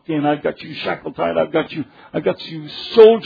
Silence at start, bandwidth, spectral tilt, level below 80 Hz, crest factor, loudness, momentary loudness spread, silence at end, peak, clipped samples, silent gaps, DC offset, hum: 0.1 s; 5 kHz; -7.5 dB/octave; -58 dBFS; 18 dB; -19 LUFS; 14 LU; 0 s; 0 dBFS; under 0.1%; none; under 0.1%; none